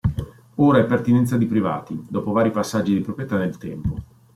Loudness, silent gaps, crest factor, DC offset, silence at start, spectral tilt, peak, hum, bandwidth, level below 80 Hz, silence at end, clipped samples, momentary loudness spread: -21 LUFS; none; 16 dB; under 0.1%; 0.05 s; -7.5 dB/octave; -4 dBFS; none; 15 kHz; -44 dBFS; 0.3 s; under 0.1%; 12 LU